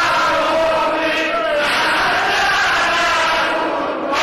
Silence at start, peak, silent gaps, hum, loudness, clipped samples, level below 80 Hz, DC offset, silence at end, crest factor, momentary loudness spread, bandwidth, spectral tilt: 0 s; -10 dBFS; none; none; -15 LUFS; under 0.1%; -46 dBFS; 0.2%; 0 s; 8 dB; 4 LU; 13 kHz; -2 dB/octave